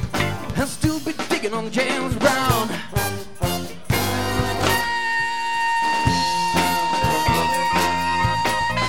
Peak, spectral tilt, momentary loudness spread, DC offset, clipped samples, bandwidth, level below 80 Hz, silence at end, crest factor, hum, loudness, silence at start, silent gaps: -2 dBFS; -4 dB/octave; 6 LU; 2%; under 0.1%; 18.5 kHz; -38 dBFS; 0 s; 18 dB; none; -21 LUFS; 0 s; none